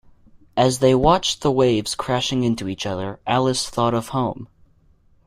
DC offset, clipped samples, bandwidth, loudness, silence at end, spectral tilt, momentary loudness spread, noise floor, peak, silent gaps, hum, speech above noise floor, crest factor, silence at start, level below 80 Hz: under 0.1%; under 0.1%; 15.5 kHz; -20 LUFS; 0.8 s; -5 dB/octave; 10 LU; -56 dBFS; -4 dBFS; none; none; 36 dB; 18 dB; 0.55 s; -44 dBFS